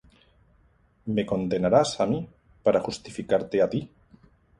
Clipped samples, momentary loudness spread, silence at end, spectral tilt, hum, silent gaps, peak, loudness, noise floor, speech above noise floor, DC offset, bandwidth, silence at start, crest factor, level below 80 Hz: under 0.1%; 14 LU; 0.75 s; -6 dB/octave; none; none; -8 dBFS; -26 LUFS; -62 dBFS; 38 dB; under 0.1%; 11.5 kHz; 1.05 s; 20 dB; -56 dBFS